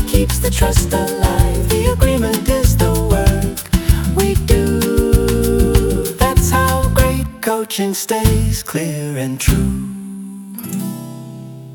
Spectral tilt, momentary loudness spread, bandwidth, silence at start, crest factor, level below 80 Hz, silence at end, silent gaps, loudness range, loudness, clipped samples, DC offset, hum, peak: -5.5 dB/octave; 11 LU; 19 kHz; 0 s; 14 dB; -20 dBFS; 0 s; none; 4 LU; -16 LUFS; under 0.1%; under 0.1%; none; 0 dBFS